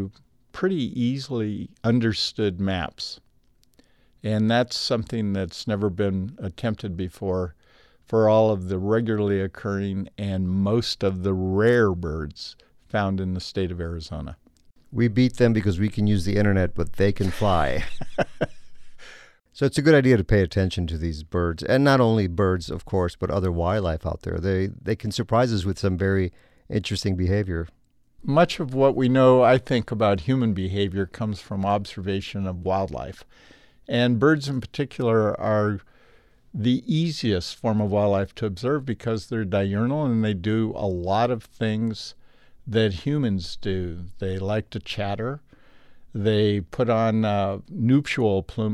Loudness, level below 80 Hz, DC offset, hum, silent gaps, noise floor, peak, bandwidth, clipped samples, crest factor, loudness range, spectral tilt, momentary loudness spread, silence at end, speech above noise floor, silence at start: -24 LUFS; -44 dBFS; under 0.1%; none; none; -62 dBFS; -4 dBFS; 12.5 kHz; under 0.1%; 20 dB; 6 LU; -7 dB/octave; 11 LU; 0 s; 40 dB; 0 s